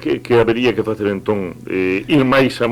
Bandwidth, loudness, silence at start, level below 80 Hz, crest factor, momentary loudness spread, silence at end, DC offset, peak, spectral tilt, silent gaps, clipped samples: 15.5 kHz; -16 LUFS; 0 s; -44 dBFS; 12 dB; 8 LU; 0 s; under 0.1%; -4 dBFS; -6.5 dB/octave; none; under 0.1%